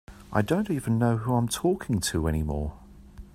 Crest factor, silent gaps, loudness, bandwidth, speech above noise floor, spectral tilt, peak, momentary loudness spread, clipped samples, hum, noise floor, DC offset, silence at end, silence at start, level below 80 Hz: 18 dB; none; -27 LUFS; 16 kHz; 20 dB; -6 dB/octave; -8 dBFS; 6 LU; under 0.1%; none; -46 dBFS; under 0.1%; 0.1 s; 0.1 s; -42 dBFS